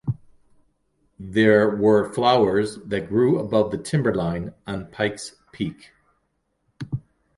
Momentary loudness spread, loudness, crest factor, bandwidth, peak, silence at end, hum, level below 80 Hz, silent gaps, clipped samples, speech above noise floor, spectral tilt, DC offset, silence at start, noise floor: 16 LU; -22 LUFS; 20 dB; 11.5 kHz; -4 dBFS; 0.4 s; none; -52 dBFS; none; under 0.1%; 51 dB; -6.5 dB/octave; under 0.1%; 0.05 s; -72 dBFS